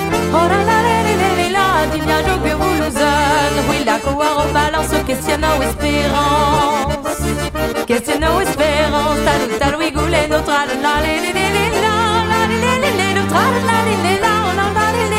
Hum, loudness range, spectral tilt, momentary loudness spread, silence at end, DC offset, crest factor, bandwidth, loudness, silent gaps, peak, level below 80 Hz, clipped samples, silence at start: none; 2 LU; -4.5 dB/octave; 4 LU; 0 s; under 0.1%; 12 dB; 16.5 kHz; -15 LUFS; none; -4 dBFS; -30 dBFS; under 0.1%; 0 s